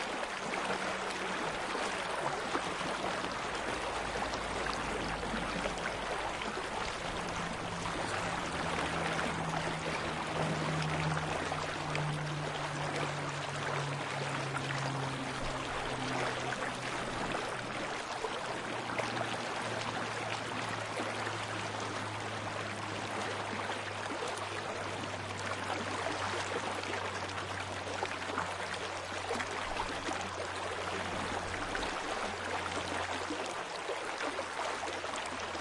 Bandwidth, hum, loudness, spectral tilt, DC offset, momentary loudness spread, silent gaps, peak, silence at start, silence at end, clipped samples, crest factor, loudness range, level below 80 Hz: 11.5 kHz; none; -36 LUFS; -4 dB/octave; under 0.1%; 3 LU; none; -18 dBFS; 0 s; 0 s; under 0.1%; 20 dB; 2 LU; -56 dBFS